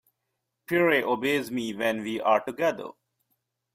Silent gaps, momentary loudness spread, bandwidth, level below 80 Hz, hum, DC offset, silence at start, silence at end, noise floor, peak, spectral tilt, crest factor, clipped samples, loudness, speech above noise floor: none; 8 LU; 16 kHz; -70 dBFS; none; under 0.1%; 0.7 s; 0.85 s; -81 dBFS; -10 dBFS; -5 dB/octave; 18 dB; under 0.1%; -26 LUFS; 55 dB